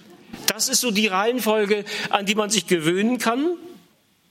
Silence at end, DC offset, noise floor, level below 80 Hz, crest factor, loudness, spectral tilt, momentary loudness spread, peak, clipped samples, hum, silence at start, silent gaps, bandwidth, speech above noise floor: 0.55 s; under 0.1%; -59 dBFS; -68 dBFS; 22 dB; -21 LUFS; -3 dB/octave; 5 LU; 0 dBFS; under 0.1%; none; 0.1 s; none; 16.5 kHz; 37 dB